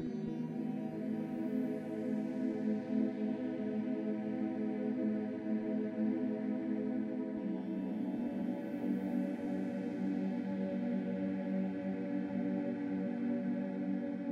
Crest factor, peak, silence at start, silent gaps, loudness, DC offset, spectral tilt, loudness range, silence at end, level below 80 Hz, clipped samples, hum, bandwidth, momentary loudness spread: 14 dB; -22 dBFS; 0 s; none; -37 LUFS; under 0.1%; -9.5 dB/octave; 1 LU; 0 s; -76 dBFS; under 0.1%; none; 6.4 kHz; 3 LU